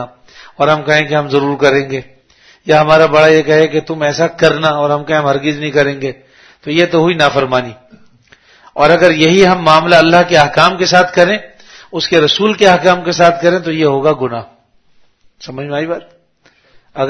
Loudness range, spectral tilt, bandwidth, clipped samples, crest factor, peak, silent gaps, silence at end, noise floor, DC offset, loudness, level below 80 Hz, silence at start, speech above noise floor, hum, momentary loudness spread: 6 LU; -5 dB/octave; 11 kHz; 0.6%; 12 dB; 0 dBFS; none; 0 s; -52 dBFS; under 0.1%; -11 LUFS; -46 dBFS; 0 s; 41 dB; none; 14 LU